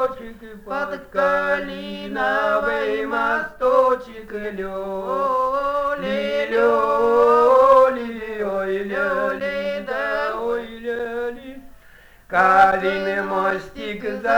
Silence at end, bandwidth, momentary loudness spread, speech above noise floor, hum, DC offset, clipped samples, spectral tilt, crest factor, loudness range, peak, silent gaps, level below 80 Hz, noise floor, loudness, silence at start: 0 s; over 20 kHz; 15 LU; 26 dB; none; under 0.1%; under 0.1%; -5.5 dB/octave; 18 dB; 7 LU; -2 dBFS; none; -50 dBFS; -48 dBFS; -20 LUFS; 0 s